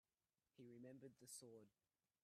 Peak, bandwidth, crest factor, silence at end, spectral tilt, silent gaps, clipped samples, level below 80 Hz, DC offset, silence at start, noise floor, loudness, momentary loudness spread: -46 dBFS; 14.5 kHz; 18 dB; 0.55 s; -4 dB/octave; none; under 0.1%; under -90 dBFS; under 0.1%; 0.55 s; under -90 dBFS; -62 LUFS; 8 LU